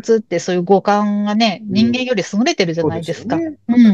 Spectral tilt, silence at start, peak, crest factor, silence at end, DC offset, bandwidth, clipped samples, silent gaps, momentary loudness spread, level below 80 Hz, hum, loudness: -5.5 dB/octave; 0.05 s; -2 dBFS; 14 dB; 0 s; 0.1%; 8 kHz; under 0.1%; none; 7 LU; -58 dBFS; none; -16 LUFS